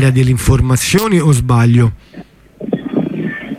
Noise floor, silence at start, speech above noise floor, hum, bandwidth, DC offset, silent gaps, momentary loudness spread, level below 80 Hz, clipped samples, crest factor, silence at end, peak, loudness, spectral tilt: -35 dBFS; 0 s; 24 dB; none; 16 kHz; under 0.1%; none; 11 LU; -28 dBFS; under 0.1%; 12 dB; 0 s; -2 dBFS; -13 LUFS; -6 dB/octave